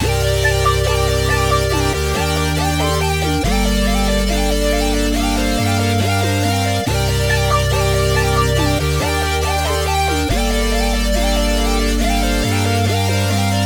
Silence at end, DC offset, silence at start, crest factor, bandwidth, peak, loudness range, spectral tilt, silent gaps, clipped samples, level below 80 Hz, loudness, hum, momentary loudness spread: 0 s; under 0.1%; 0 s; 14 dB; over 20 kHz; -2 dBFS; 1 LU; -4.5 dB/octave; none; under 0.1%; -22 dBFS; -16 LUFS; none; 2 LU